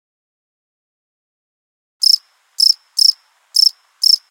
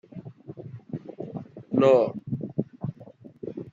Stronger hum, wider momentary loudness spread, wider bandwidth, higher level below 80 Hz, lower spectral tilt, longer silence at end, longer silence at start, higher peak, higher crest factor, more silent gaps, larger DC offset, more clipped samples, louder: neither; second, 3 LU vs 23 LU; first, 17.5 kHz vs 7.6 kHz; second, under -90 dBFS vs -66 dBFS; second, 11.5 dB/octave vs -8.5 dB/octave; about the same, 0.1 s vs 0 s; first, 2 s vs 0.15 s; first, -2 dBFS vs -8 dBFS; about the same, 16 dB vs 20 dB; neither; neither; neither; first, -12 LUFS vs -26 LUFS